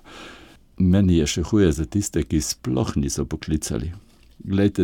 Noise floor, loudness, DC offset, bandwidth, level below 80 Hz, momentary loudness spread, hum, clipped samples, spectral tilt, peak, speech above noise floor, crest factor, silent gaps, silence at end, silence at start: -47 dBFS; -22 LUFS; under 0.1%; 17.5 kHz; -36 dBFS; 16 LU; none; under 0.1%; -6 dB/octave; -4 dBFS; 26 dB; 18 dB; none; 0 s; 0.05 s